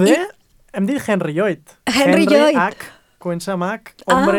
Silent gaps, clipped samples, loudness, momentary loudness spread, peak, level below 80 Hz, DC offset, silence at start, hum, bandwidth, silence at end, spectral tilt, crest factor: none; under 0.1%; -17 LUFS; 17 LU; -2 dBFS; -52 dBFS; under 0.1%; 0 s; none; 17.5 kHz; 0 s; -5 dB/octave; 16 dB